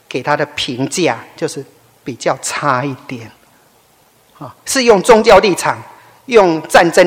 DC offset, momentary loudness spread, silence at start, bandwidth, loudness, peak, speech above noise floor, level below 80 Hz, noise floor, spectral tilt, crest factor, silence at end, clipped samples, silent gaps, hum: under 0.1%; 21 LU; 0.1 s; 17 kHz; -13 LUFS; 0 dBFS; 39 dB; -44 dBFS; -51 dBFS; -4 dB/octave; 14 dB; 0 s; 1%; none; none